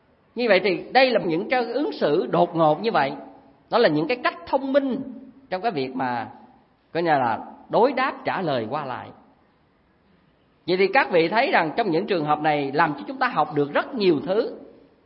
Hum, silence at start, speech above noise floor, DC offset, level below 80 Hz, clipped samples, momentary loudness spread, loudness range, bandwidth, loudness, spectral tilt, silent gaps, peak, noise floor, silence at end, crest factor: none; 0.35 s; 39 dB; under 0.1%; -68 dBFS; under 0.1%; 12 LU; 5 LU; 5.8 kHz; -22 LUFS; -10 dB/octave; none; -4 dBFS; -61 dBFS; 0.4 s; 20 dB